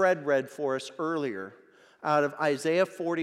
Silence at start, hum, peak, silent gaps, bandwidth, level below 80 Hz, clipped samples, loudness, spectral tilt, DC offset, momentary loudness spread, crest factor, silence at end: 0 s; none; -12 dBFS; none; 13.5 kHz; -88 dBFS; under 0.1%; -28 LUFS; -5 dB/octave; under 0.1%; 10 LU; 16 dB; 0 s